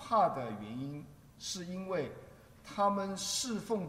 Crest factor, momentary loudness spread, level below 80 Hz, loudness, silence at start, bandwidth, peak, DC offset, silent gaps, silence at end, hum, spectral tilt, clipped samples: 20 dB; 16 LU; -66 dBFS; -36 LUFS; 0 s; 16 kHz; -16 dBFS; under 0.1%; none; 0 s; none; -4 dB/octave; under 0.1%